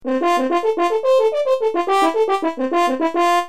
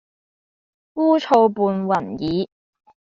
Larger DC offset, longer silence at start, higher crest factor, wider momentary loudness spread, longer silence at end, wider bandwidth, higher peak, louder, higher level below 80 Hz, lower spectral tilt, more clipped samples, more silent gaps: first, 1% vs under 0.1%; second, 0.05 s vs 0.95 s; second, 12 dB vs 18 dB; second, 3 LU vs 11 LU; second, 0 s vs 0.7 s; first, 15 kHz vs 7.4 kHz; about the same, -4 dBFS vs -4 dBFS; about the same, -18 LUFS vs -19 LUFS; second, -66 dBFS vs -58 dBFS; second, -2.5 dB/octave vs -5.5 dB/octave; neither; neither